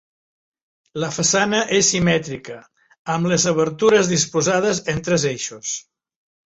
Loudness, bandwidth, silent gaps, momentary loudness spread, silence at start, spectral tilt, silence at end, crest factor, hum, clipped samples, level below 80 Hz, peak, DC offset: -18 LUFS; 8.2 kHz; 2.99-3.05 s; 15 LU; 0.95 s; -3.5 dB/octave; 0.7 s; 18 dB; none; under 0.1%; -54 dBFS; -4 dBFS; under 0.1%